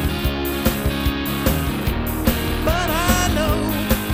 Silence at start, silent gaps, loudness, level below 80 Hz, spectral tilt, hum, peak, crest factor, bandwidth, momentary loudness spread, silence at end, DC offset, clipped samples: 0 s; none; -20 LUFS; -26 dBFS; -5 dB/octave; none; -4 dBFS; 16 dB; 16 kHz; 4 LU; 0 s; under 0.1%; under 0.1%